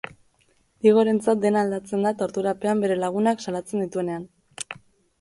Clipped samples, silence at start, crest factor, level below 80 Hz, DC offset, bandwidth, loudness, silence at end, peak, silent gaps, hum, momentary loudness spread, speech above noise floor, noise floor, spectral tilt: under 0.1%; 0.85 s; 18 dB; -66 dBFS; under 0.1%; 11.5 kHz; -23 LUFS; 0.45 s; -6 dBFS; none; none; 16 LU; 42 dB; -64 dBFS; -6 dB/octave